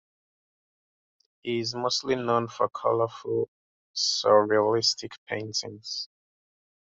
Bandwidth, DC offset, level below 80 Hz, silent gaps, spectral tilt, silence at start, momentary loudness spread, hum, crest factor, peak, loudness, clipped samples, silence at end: 8 kHz; under 0.1%; -72 dBFS; 3.48-3.94 s, 5.18-5.26 s; -3.5 dB/octave; 1.45 s; 14 LU; none; 20 dB; -8 dBFS; -26 LUFS; under 0.1%; 0.8 s